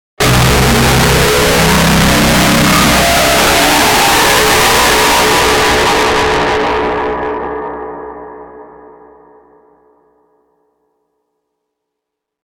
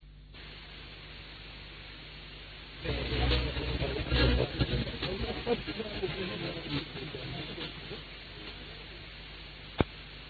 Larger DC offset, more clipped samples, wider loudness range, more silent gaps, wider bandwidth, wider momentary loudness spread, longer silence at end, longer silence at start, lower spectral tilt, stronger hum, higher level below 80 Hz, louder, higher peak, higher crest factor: neither; neither; first, 14 LU vs 8 LU; neither; first, 19.5 kHz vs 4.9 kHz; second, 12 LU vs 16 LU; first, 3.8 s vs 0 s; first, 0.2 s vs 0 s; second, -3.5 dB/octave vs -8 dB/octave; neither; first, -26 dBFS vs -40 dBFS; first, -9 LUFS vs -35 LUFS; first, 0 dBFS vs -8 dBFS; second, 12 dB vs 28 dB